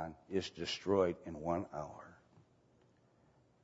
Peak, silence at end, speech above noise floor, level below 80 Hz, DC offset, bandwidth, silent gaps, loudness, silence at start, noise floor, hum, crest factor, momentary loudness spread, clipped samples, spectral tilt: -20 dBFS; 1.5 s; 32 dB; -68 dBFS; under 0.1%; 7.6 kHz; none; -38 LUFS; 0 s; -70 dBFS; none; 20 dB; 14 LU; under 0.1%; -4.5 dB/octave